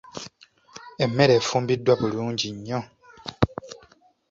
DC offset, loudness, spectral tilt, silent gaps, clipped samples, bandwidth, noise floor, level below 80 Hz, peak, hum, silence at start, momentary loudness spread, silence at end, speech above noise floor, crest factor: under 0.1%; -23 LUFS; -5.5 dB/octave; none; under 0.1%; 7.8 kHz; -57 dBFS; -50 dBFS; -2 dBFS; none; 0.15 s; 25 LU; 0.55 s; 35 dB; 24 dB